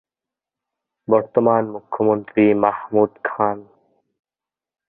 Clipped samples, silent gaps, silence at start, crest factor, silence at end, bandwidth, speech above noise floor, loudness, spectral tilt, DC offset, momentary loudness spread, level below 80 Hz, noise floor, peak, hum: under 0.1%; none; 1.1 s; 20 dB; 1.25 s; 3.8 kHz; 72 dB; -19 LUFS; -12 dB/octave; under 0.1%; 7 LU; -62 dBFS; -90 dBFS; -2 dBFS; none